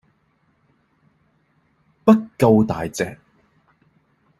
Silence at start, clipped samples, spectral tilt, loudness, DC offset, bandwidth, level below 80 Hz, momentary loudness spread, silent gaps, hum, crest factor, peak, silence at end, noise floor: 2.05 s; under 0.1%; -7 dB/octave; -18 LUFS; under 0.1%; 13 kHz; -54 dBFS; 11 LU; none; none; 20 dB; -2 dBFS; 1.25 s; -64 dBFS